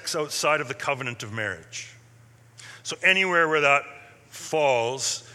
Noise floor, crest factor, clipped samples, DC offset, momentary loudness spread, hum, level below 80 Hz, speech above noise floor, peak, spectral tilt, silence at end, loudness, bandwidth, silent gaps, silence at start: -53 dBFS; 22 dB; under 0.1%; under 0.1%; 19 LU; none; -72 dBFS; 29 dB; -4 dBFS; -2.5 dB/octave; 0 s; -23 LUFS; 16 kHz; none; 0 s